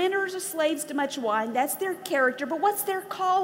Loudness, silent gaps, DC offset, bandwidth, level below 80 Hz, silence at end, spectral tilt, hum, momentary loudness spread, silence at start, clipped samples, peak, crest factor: -27 LUFS; none; under 0.1%; 16.5 kHz; -80 dBFS; 0 s; -2 dB/octave; none; 4 LU; 0 s; under 0.1%; -10 dBFS; 16 dB